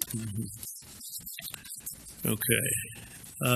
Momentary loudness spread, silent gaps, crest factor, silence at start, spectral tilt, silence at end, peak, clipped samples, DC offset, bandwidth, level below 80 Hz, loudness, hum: 15 LU; none; 26 dB; 0 s; -3.5 dB/octave; 0 s; -8 dBFS; under 0.1%; under 0.1%; 15 kHz; -58 dBFS; -33 LUFS; none